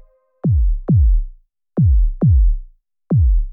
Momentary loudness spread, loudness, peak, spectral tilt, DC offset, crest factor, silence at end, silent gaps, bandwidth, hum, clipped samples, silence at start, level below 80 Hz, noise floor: 9 LU; -17 LUFS; -8 dBFS; -16 dB/octave; under 0.1%; 8 dB; 0 s; none; 1.5 kHz; none; under 0.1%; 0.45 s; -16 dBFS; -41 dBFS